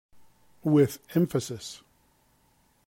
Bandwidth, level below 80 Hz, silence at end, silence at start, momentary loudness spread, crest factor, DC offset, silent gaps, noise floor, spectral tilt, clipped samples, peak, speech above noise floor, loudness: 16.5 kHz; -66 dBFS; 1.1 s; 0.65 s; 18 LU; 18 dB; under 0.1%; none; -66 dBFS; -7 dB/octave; under 0.1%; -10 dBFS; 40 dB; -27 LUFS